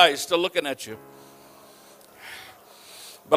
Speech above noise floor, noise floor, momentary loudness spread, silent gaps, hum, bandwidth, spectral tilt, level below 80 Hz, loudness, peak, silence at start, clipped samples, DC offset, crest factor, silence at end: 28 dB; -51 dBFS; 26 LU; none; none; 15.5 kHz; -2 dB/octave; -70 dBFS; -24 LUFS; -2 dBFS; 0 s; under 0.1%; under 0.1%; 26 dB; 0 s